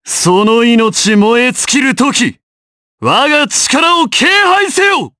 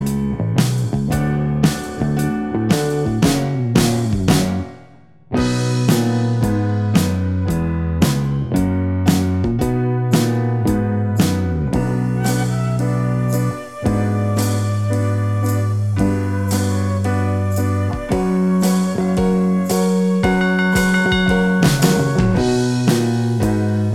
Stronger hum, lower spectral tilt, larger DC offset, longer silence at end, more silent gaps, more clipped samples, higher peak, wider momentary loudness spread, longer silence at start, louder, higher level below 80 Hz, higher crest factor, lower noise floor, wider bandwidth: neither; second, -2.5 dB/octave vs -6 dB/octave; second, under 0.1% vs 0.4%; about the same, 0.1 s vs 0 s; first, 2.43-2.98 s vs none; neither; about the same, 0 dBFS vs 0 dBFS; about the same, 3 LU vs 4 LU; about the same, 0.05 s vs 0 s; first, -9 LUFS vs -18 LUFS; second, -52 dBFS vs -34 dBFS; second, 10 dB vs 16 dB; first, under -90 dBFS vs -46 dBFS; second, 11 kHz vs 16.5 kHz